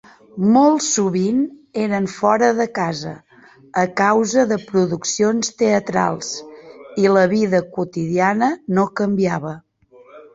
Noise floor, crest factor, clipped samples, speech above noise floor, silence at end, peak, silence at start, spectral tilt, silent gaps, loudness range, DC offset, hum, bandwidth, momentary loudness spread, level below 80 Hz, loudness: -48 dBFS; 16 dB; under 0.1%; 31 dB; 0.15 s; -2 dBFS; 0.35 s; -5 dB/octave; none; 2 LU; under 0.1%; none; 8 kHz; 11 LU; -60 dBFS; -18 LUFS